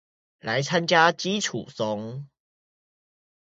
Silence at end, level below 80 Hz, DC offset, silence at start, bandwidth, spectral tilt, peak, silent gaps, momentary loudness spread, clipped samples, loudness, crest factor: 1.15 s; -70 dBFS; under 0.1%; 0.45 s; 8 kHz; -3.5 dB/octave; -4 dBFS; none; 18 LU; under 0.1%; -24 LUFS; 24 dB